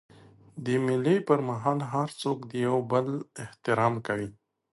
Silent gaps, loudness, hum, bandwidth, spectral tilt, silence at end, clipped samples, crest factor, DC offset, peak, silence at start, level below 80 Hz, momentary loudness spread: none; -28 LUFS; none; 11.5 kHz; -7 dB/octave; 0.45 s; under 0.1%; 20 dB; under 0.1%; -10 dBFS; 0.55 s; -66 dBFS; 11 LU